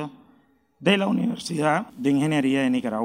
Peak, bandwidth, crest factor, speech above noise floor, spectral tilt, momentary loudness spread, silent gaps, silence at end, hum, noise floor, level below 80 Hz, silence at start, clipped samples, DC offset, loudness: -6 dBFS; 15 kHz; 18 dB; 38 dB; -5.5 dB/octave; 5 LU; none; 0 s; none; -61 dBFS; -66 dBFS; 0 s; under 0.1%; under 0.1%; -23 LUFS